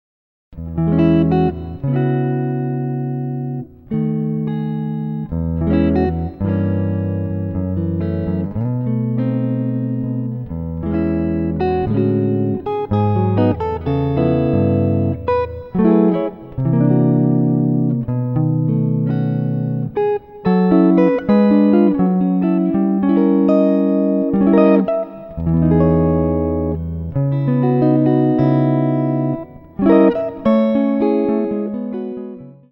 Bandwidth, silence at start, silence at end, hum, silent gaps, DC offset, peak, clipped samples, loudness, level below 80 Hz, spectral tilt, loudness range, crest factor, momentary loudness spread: 5.2 kHz; 0.5 s; 0.2 s; none; none; under 0.1%; 0 dBFS; under 0.1%; -17 LUFS; -38 dBFS; -12 dB/octave; 6 LU; 16 dB; 9 LU